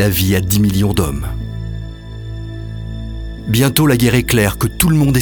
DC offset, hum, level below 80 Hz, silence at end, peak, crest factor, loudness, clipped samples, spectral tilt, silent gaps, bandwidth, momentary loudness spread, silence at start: under 0.1%; none; -28 dBFS; 0 s; 0 dBFS; 16 dB; -14 LUFS; under 0.1%; -5 dB/octave; none; over 20 kHz; 16 LU; 0 s